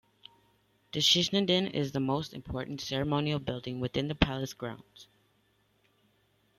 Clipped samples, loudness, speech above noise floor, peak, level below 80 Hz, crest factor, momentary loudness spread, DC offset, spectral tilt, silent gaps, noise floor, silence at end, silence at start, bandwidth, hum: under 0.1%; -30 LUFS; 40 dB; -8 dBFS; -50 dBFS; 26 dB; 14 LU; under 0.1%; -4.5 dB/octave; none; -71 dBFS; 1.55 s; 0.95 s; 15.5 kHz; none